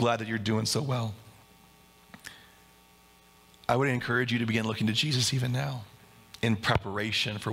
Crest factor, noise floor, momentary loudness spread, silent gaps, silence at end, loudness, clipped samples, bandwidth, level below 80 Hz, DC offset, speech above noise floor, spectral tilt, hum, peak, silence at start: 22 dB; -58 dBFS; 15 LU; none; 0 s; -29 LUFS; under 0.1%; 16.5 kHz; -58 dBFS; under 0.1%; 30 dB; -4.5 dB/octave; none; -8 dBFS; 0 s